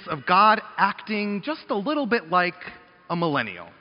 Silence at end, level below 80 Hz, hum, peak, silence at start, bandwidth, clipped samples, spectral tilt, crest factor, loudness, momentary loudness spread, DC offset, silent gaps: 0.1 s; -66 dBFS; none; -4 dBFS; 0 s; 5.6 kHz; under 0.1%; -3 dB/octave; 20 dB; -23 LUFS; 14 LU; under 0.1%; none